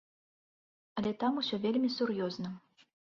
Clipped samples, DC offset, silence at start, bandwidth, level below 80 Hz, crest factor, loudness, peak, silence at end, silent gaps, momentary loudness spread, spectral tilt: under 0.1%; under 0.1%; 0.95 s; 7 kHz; -74 dBFS; 16 dB; -34 LUFS; -20 dBFS; 0.55 s; none; 12 LU; -6.5 dB/octave